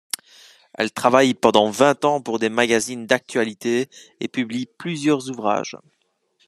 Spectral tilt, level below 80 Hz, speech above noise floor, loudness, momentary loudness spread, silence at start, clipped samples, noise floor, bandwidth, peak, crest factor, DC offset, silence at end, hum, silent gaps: -4 dB/octave; -66 dBFS; 47 dB; -20 LUFS; 12 LU; 0.8 s; under 0.1%; -67 dBFS; 13.5 kHz; 0 dBFS; 20 dB; under 0.1%; 0.7 s; none; none